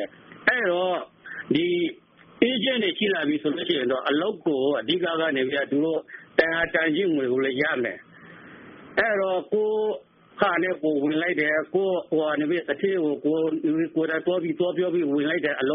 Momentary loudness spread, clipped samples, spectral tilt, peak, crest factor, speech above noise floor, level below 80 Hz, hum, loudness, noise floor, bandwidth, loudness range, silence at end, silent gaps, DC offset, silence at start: 4 LU; under 0.1%; -2.5 dB/octave; -2 dBFS; 22 dB; 22 dB; -64 dBFS; none; -24 LUFS; -46 dBFS; 4.2 kHz; 2 LU; 0 s; none; under 0.1%; 0 s